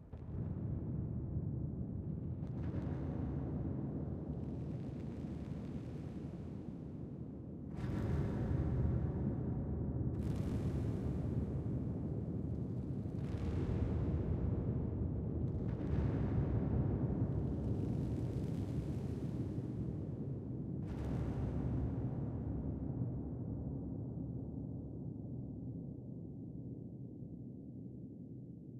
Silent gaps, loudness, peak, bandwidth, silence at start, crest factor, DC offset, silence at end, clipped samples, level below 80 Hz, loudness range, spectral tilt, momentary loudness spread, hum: none; -41 LUFS; -24 dBFS; 8.2 kHz; 0 s; 16 dB; under 0.1%; 0 s; under 0.1%; -48 dBFS; 8 LU; -10.5 dB/octave; 11 LU; none